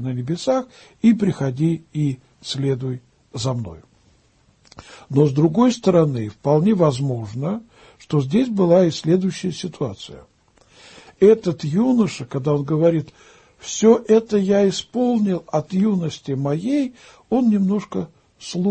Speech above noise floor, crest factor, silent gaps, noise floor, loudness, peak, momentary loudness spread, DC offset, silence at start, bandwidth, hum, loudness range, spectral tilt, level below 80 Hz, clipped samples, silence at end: 39 dB; 18 dB; none; -58 dBFS; -20 LUFS; -2 dBFS; 13 LU; under 0.1%; 0 s; 8.8 kHz; none; 4 LU; -7 dB/octave; -56 dBFS; under 0.1%; 0 s